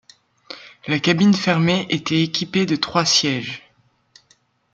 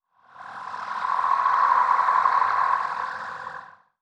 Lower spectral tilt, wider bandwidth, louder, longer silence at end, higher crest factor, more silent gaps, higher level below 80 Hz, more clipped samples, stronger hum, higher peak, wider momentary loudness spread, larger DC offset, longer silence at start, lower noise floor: first, -4.5 dB/octave vs -2 dB/octave; about the same, 9 kHz vs 9.2 kHz; first, -18 LUFS vs -22 LUFS; first, 1.15 s vs 0.35 s; about the same, 18 dB vs 16 dB; neither; first, -60 dBFS vs -72 dBFS; neither; neither; first, -2 dBFS vs -8 dBFS; about the same, 19 LU vs 18 LU; neither; first, 0.5 s vs 0.35 s; first, -60 dBFS vs -45 dBFS